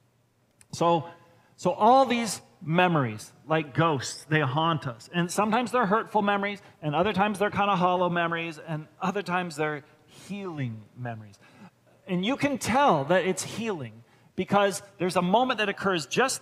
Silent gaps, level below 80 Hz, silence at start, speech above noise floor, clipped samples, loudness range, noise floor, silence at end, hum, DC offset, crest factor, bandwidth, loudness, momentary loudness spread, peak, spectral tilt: none; -66 dBFS; 0.75 s; 41 dB; under 0.1%; 7 LU; -67 dBFS; 0.05 s; none; under 0.1%; 20 dB; 15.5 kHz; -26 LUFS; 14 LU; -6 dBFS; -5 dB/octave